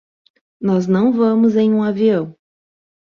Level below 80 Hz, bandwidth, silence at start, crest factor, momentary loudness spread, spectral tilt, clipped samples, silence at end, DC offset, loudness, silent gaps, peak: -60 dBFS; 7 kHz; 0.6 s; 12 dB; 8 LU; -8.5 dB/octave; under 0.1%; 0.75 s; under 0.1%; -16 LUFS; none; -4 dBFS